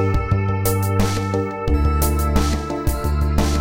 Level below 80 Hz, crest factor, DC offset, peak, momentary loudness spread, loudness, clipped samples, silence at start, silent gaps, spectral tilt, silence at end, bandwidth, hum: -22 dBFS; 14 dB; under 0.1%; -4 dBFS; 4 LU; -20 LUFS; under 0.1%; 0 s; none; -6 dB/octave; 0 s; 17 kHz; none